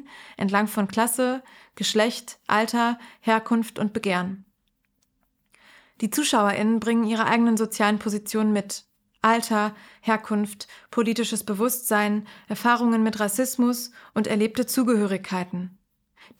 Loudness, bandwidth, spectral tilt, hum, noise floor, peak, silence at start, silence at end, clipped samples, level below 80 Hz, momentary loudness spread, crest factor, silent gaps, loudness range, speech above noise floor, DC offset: -24 LUFS; 17.5 kHz; -4 dB/octave; none; -72 dBFS; -4 dBFS; 0.1 s; 0.7 s; under 0.1%; -68 dBFS; 10 LU; 20 dB; none; 3 LU; 49 dB; under 0.1%